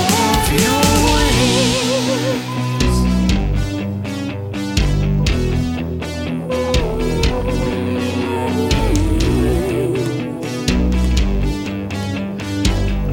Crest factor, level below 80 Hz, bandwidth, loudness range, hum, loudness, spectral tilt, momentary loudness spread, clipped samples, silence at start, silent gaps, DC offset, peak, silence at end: 16 dB; -22 dBFS; 18 kHz; 4 LU; none; -18 LUFS; -5 dB/octave; 9 LU; under 0.1%; 0 s; none; under 0.1%; 0 dBFS; 0 s